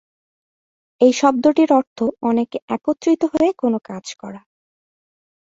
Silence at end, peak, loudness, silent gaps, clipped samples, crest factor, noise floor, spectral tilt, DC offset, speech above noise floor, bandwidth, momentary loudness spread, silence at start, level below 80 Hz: 1.2 s; -2 dBFS; -18 LUFS; 1.87-1.96 s, 2.62-2.68 s; under 0.1%; 18 dB; under -90 dBFS; -5 dB/octave; under 0.1%; over 72 dB; 7.8 kHz; 17 LU; 1 s; -62 dBFS